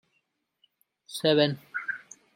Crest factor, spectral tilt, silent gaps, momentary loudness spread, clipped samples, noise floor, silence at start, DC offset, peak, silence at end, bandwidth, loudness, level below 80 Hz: 22 dB; -5 dB/octave; none; 16 LU; under 0.1%; -76 dBFS; 1.1 s; under 0.1%; -8 dBFS; 0.35 s; 16.5 kHz; -27 LUFS; -76 dBFS